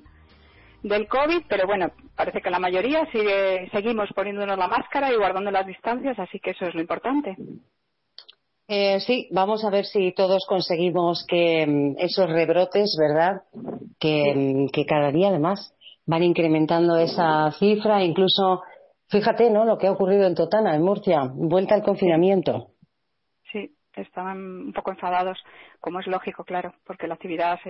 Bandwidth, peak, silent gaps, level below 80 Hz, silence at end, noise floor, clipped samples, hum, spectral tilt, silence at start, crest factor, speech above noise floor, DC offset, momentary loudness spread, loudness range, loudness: 6 kHz; -8 dBFS; none; -60 dBFS; 0 s; -78 dBFS; under 0.1%; none; -9 dB/octave; 0.85 s; 16 dB; 56 dB; under 0.1%; 13 LU; 8 LU; -22 LUFS